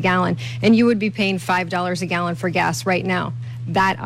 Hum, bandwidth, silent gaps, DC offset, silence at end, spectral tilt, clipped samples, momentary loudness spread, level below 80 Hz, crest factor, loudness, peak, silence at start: none; 14.5 kHz; none; under 0.1%; 0 s; -5.5 dB/octave; under 0.1%; 7 LU; -52 dBFS; 12 dB; -20 LUFS; -6 dBFS; 0 s